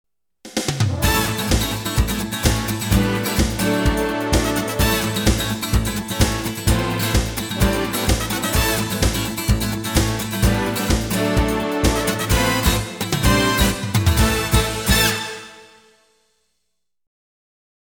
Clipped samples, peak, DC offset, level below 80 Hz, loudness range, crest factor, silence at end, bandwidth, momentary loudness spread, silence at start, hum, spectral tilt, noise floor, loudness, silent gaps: under 0.1%; -2 dBFS; under 0.1%; -26 dBFS; 2 LU; 18 dB; 2.3 s; over 20 kHz; 5 LU; 0.45 s; none; -4 dB/octave; -77 dBFS; -19 LUFS; none